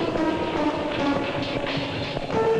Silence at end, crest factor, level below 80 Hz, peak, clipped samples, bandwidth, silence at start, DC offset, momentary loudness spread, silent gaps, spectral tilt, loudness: 0 s; 10 dB; -46 dBFS; -14 dBFS; under 0.1%; 10.5 kHz; 0 s; under 0.1%; 3 LU; none; -6 dB/octave; -25 LUFS